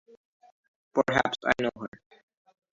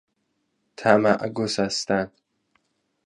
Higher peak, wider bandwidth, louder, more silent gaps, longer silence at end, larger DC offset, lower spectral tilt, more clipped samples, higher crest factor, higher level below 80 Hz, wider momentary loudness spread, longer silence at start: second, -6 dBFS vs 0 dBFS; second, 7.8 kHz vs 11 kHz; second, -27 LUFS vs -22 LUFS; neither; second, 0.85 s vs 1 s; neither; about the same, -5 dB/octave vs -4.5 dB/octave; neither; about the same, 24 dB vs 24 dB; about the same, -60 dBFS vs -60 dBFS; first, 15 LU vs 7 LU; first, 0.95 s vs 0.8 s